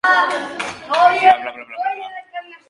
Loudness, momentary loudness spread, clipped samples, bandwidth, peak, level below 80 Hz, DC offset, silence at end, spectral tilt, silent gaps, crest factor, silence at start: -16 LUFS; 18 LU; under 0.1%; 11.5 kHz; 0 dBFS; -64 dBFS; under 0.1%; 0.15 s; -2 dB/octave; none; 18 dB; 0.05 s